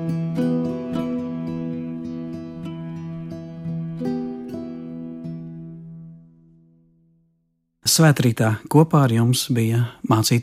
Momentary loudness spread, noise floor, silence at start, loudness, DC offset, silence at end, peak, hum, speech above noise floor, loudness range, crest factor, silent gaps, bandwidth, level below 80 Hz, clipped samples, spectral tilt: 17 LU; -70 dBFS; 0 s; -22 LUFS; under 0.1%; 0 s; -2 dBFS; none; 52 dB; 14 LU; 20 dB; none; 16 kHz; -58 dBFS; under 0.1%; -5.5 dB/octave